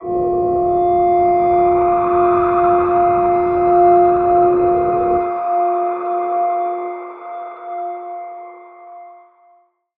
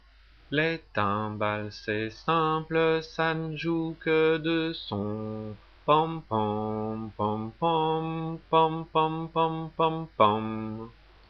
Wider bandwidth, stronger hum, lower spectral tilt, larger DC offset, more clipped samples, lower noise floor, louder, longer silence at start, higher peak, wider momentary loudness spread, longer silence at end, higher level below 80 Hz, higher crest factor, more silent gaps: second, 3.7 kHz vs 6.6 kHz; neither; first, -11.5 dB/octave vs -7.5 dB/octave; neither; neither; about the same, -54 dBFS vs -56 dBFS; first, -15 LUFS vs -28 LUFS; second, 0 s vs 0.5 s; first, -2 dBFS vs -8 dBFS; first, 17 LU vs 10 LU; first, 0.85 s vs 0.4 s; first, -44 dBFS vs -56 dBFS; second, 14 dB vs 20 dB; neither